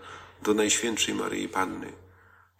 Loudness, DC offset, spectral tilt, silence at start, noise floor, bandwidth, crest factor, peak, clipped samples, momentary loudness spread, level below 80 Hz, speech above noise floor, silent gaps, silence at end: -27 LUFS; under 0.1%; -2 dB/octave; 0 s; -58 dBFS; 16 kHz; 18 dB; -12 dBFS; under 0.1%; 17 LU; -66 dBFS; 30 dB; none; 0.55 s